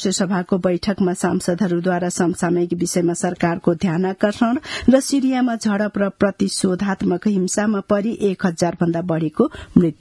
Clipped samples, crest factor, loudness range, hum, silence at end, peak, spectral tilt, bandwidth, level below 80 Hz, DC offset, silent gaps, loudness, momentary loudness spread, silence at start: under 0.1%; 18 dB; 1 LU; none; 0.05 s; 0 dBFS; -5.5 dB/octave; 12 kHz; -50 dBFS; under 0.1%; none; -19 LUFS; 3 LU; 0 s